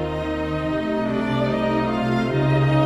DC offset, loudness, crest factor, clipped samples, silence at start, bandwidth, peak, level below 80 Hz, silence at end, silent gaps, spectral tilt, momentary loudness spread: under 0.1%; -22 LUFS; 14 dB; under 0.1%; 0 s; 10 kHz; -6 dBFS; -40 dBFS; 0 s; none; -8 dB/octave; 5 LU